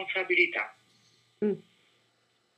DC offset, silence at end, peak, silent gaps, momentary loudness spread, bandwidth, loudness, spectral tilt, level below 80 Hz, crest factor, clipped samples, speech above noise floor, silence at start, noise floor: under 0.1%; 0.95 s; -10 dBFS; none; 14 LU; 8.4 kHz; -28 LUFS; -6 dB/octave; under -90 dBFS; 22 dB; under 0.1%; 42 dB; 0 s; -71 dBFS